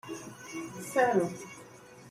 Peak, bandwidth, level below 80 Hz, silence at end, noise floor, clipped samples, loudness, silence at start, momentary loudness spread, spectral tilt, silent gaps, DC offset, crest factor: -16 dBFS; 16 kHz; -72 dBFS; 0 s; -52 dBFS; under 0.1%; -31 LUFS; 0.05 s; 23 LU; -5 dB/octave; none; under 0.1%; 18 dB